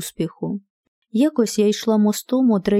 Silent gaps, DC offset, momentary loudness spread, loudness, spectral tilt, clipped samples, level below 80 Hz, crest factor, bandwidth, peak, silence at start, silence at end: 0.70-1.02 s; under 0.1%; 11 LU; -20 LUFS; -5.5 dB/octave; under 0.1%; -58 dBFS; 14 dB; 16 kHz; -6 dBFS; 0 s; 0 s